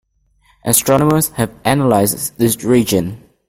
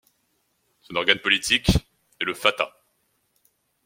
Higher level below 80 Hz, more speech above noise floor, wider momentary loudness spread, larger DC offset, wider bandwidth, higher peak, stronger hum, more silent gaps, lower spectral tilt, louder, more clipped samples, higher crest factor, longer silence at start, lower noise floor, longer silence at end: about the same, -44 dBFS vs -40 dBFS; second, 42 dB vs 48 dB; second, 6 LU vs 11 LU; neither; about the same, 16.5 kHz vs 16.5 kHz; about the same, 0 dBFS vs -2 dBFS; neither; neither; first, -5 dB/octave vs -3.5 dB/octave; first, -14 LUFS vs -22 LUFS; neither; second, 16 dB vs 26 dB; second, 0.65 s vs 0.9 s; second, -56 dBFS vs -70 dBFS; second, 0.3 s vs 1.2 s